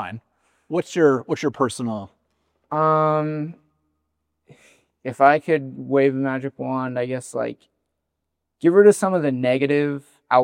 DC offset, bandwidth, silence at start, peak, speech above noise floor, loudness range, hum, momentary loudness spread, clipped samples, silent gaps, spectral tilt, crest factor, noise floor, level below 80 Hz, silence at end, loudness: under 0.1%; 12.5 kHz; 0 s; 0 dBFS; 60 dB; 4 LU; none; 15 LU; under 0.1%; none; -6.5 dB/octave; 22 dB; -79 dBFS; -74 dBFS; 0 s; -20 LUFS